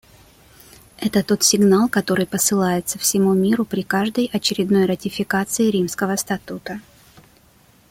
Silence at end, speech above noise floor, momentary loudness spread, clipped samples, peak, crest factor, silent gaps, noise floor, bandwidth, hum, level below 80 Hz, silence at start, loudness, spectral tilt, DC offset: 1.1 s; 34 dB; 11 LU; under 0.1%; -2 dBFS; 18 dB; none; -53 dBFS; 17 kHz; none; -54 dBFS; 1 s; -19 LUFS; -4 dB/octave; under 0.1%